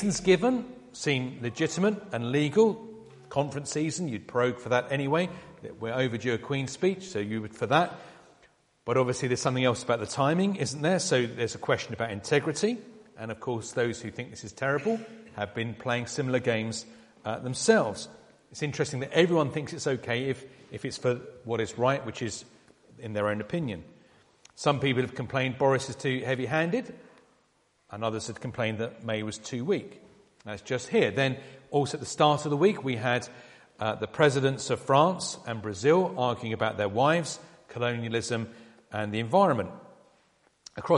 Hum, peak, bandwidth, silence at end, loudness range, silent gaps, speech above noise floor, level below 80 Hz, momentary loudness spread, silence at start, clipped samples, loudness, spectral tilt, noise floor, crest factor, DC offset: none; -6 dBFS; 11.5 kHz; 0 s; 5 LU; none; 40 dB; -64 dBFS; 14 LU; 0 s; under 0.1%; -28 LUFS; -5 dB/octave; -69 dBFS; 22 dB; under 0.1%